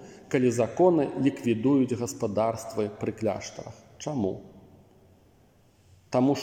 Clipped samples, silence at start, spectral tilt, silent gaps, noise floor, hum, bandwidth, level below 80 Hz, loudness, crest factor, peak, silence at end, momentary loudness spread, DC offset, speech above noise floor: under 0.1%; 0 s; -6.5 dB/octave; none; -60 dBFS; none; 15.5 kHz; -66 dBFS; -27 LUFS; 20 dB; -8 dBFS; 0 s; 14 LU; under 0.1%; 34 dB